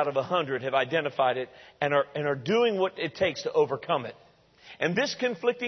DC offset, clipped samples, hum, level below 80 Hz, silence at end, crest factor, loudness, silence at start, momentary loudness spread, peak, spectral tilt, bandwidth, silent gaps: under 0.1%; under 0.1%; none; -68 dBFS; 0 s; 18 dB; -27 LUFS; 0 s; 5 LU; -10 dBFS; -5 dB/octave; 6.4 kHz; none